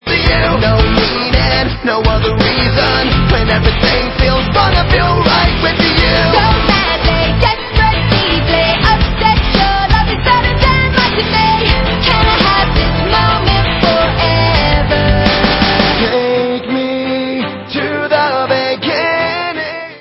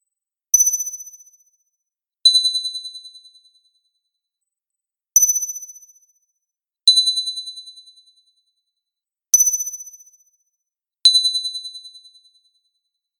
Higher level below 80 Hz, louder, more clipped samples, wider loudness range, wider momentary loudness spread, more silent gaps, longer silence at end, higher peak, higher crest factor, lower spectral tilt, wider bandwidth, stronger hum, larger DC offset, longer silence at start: first, -18 dBFS vs -84 dBFS; first, -11 LUFS vs -15 LUFS; neither; about the same, 3 LU vs 4 LU; second, 5 LU vs 22 LU; neither; second, 0 s vs 1.2 s; about the same, 0 dBFS vs 0 dBFS; second, 12 dB vs 22 dB; first, -7.5 dB/octave vs 7.5 dB/octave; second, 8 kHz vs 19 kHz; neither; neither; second, 0.05 s vs 0.55 s